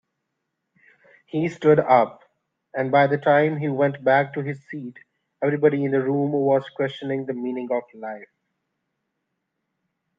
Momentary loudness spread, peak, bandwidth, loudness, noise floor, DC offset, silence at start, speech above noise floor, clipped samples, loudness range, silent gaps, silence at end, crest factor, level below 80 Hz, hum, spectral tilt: 16 LU; -2 dBFS; 7.4 kHz; -22 LUFS; -79 dBFS; under 0.1%; 1.35 s; 57 dB; under 0.1%; 7 LU; none; 1.95 s; 20 dB; -72 dBFS; none; -8.5 dB/octave